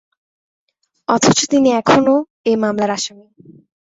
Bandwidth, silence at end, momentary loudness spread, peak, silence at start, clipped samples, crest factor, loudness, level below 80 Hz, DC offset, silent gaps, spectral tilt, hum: 8 kHz; 0.8 s; 9 LU; 0 dBFS; 1.1 s; under 0.1%; 16 dB; -15 LUFS; -54 dBFS; under 0.1%; 2.30-2.44 s; -4 dB/octave; none